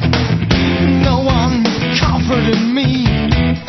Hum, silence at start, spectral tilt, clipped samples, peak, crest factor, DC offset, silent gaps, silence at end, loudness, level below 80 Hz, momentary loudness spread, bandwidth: none; 0 s; -6.5 dB/octave; under 0.1%; 0 dBFS; 12 dB; under 0.1%; none; 0 s; -14 LUFS; -24 dBFS; 2 LU; 6.4 kHz